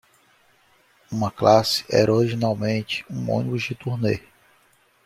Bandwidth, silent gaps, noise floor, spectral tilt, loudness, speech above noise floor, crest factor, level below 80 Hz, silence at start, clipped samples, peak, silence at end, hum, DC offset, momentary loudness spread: 15.5 kHz; none; -60 dBFS; -5.5 dB/octave; -22 LUFS; 39 dB; 22 dB; -58 dBFS; 1.1 s; under 0.1%; -2 dBFS; 0.85 s; none; under 0.1%; 10 LU